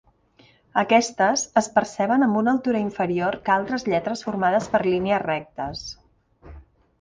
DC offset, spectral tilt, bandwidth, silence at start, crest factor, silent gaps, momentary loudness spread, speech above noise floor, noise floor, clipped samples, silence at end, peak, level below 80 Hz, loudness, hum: under 0.1%; -4.5 dB/octave; 10 kHz; 0.75 s; 20 dB; none; 9 LU; 35 dB; -57 dBFS; under 0.1%; 0.4 s; -4 dBFS; -54 dBFS; -22 LUFS; none